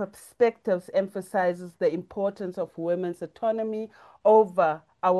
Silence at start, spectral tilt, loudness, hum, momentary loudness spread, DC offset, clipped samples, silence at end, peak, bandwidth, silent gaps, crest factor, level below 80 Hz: 0 s; -7 dB/octave; -26 LUFS; none; 13 LU; under 0.1%; under 0.1%; 0 s; -10 dBFS; 12.5 kHz; none; 16 dB; -70 dBFS